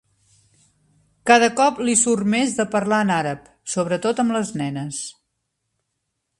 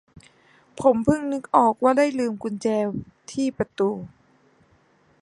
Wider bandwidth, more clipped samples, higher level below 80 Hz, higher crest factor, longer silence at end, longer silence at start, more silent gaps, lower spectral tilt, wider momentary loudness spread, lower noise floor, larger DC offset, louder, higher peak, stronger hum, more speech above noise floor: about the same, 11.5 kHz vs 11.5 kHz; neither; second, -62 dBFS vs -56 dBFS; about the same, 22 dB vs 20 dB; first, 1.3 s vs 1.15 s; first, 1.25 s vs 0.8 s; neither; second, -3.5 dB/octave vs -6.5 dB/octave; about the same, 13 LU vs 12 LU; first, -76 dBFS vs -60 dBFS; neither; first, -20 LUFS vs -23 LUFS; first, 0 dBFS vs -4 dBFS; neither; first, 57 dB vs 38 dB